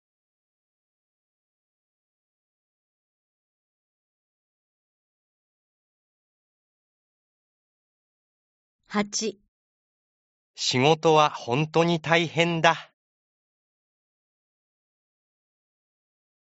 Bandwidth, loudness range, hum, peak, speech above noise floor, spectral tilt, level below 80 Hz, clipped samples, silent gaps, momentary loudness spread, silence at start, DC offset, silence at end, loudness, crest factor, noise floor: 8 kHz; 12 LU; none; -2 dBFS; over 67 dB; -3.5 dB/octave; -72 dBFS; under 0.1%; 9.48-10.54 s; 10 LU; 8.9 s; under 0.1%; 3.6 s; -23 LUFS; 28 dB; under -90 dBFS